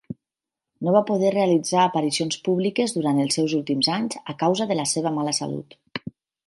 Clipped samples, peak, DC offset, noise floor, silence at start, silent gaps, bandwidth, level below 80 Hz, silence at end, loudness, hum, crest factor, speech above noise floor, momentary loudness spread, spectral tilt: under 0.1%; -4 dBFS; under 0.1%; -88 dBFS; 0.1 s; none; 11.5 kHz; -68 dBFS; 0.35 s; -22 LUFS; none; 20 dB; 66 dB; 15 LU; -4.5 dB/octave